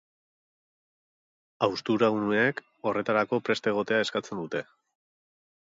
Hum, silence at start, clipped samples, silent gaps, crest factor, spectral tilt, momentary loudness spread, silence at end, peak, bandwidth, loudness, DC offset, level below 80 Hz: none; 1.6 s; under 0.1%; none; 20 dB; -5.5 dB/octave; 9 LU; 1.1 s; -10 dBFS; 7.8 kHz; -27 LUFS; under 0.1%; -72 dBFS